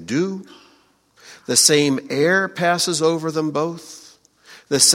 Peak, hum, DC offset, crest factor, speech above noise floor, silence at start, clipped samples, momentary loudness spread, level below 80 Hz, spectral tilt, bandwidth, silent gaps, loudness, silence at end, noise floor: 0 dBFS; none; under 0.1%; 20 dB; 38 dB; 0 s; under 0.1%; 18 LU; -66 dBFS; -2.5 dB/octave; 16.5 kHz; none; -18 LUFS; 0 s; -57 dBFS